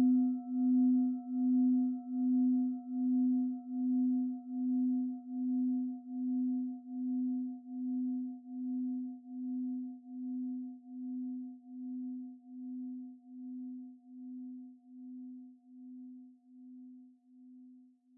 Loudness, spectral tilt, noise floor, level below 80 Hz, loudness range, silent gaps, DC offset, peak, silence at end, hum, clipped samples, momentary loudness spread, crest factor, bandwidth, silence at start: -35 LUFS; -4.5 dB/octave; -60 dBFS; under -90 dBFS; 18 LU; none; under 0.1%; -22 dBFS; 0.35 s; none; under 0.1%; 21 LU; 12 dB; 0.8 kHz; 0 s